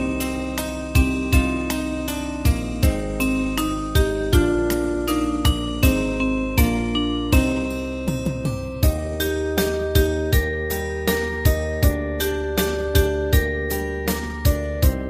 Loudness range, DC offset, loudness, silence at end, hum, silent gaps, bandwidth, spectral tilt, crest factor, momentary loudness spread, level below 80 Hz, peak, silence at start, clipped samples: 2 LU; under 0.1%; -22 LUFS; 0 s; none; none; 15.5 kHz; -5.5 dB/octave; 16 dB; 5 LU; -26 dBFS; -4 dBFS; 0 s; under 0.1%